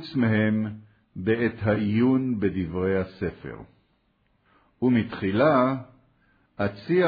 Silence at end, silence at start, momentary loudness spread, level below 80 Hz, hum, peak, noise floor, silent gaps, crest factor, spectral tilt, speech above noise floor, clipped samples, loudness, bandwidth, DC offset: 0 s; 0 s; 13 LU; -56 dBFS; none; -8 dBFS; -68 dBFS; none; 16 dB; -10.5 dB/octave; 44 dB; under 0.1%; -25 LUFS; 5 kHz; under 0.1%